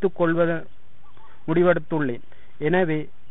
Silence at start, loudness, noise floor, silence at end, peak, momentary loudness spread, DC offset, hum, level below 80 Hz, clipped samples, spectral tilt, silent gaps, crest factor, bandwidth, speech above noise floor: 0 s; -23 LUFS; -53 dBFS; 0.25 s; -6 dBFS; 11 LU; 3%; none; -58 dBFS; under 0.1%; -12 dB/octave; none; 18 dB; 4 kHz; 31 dB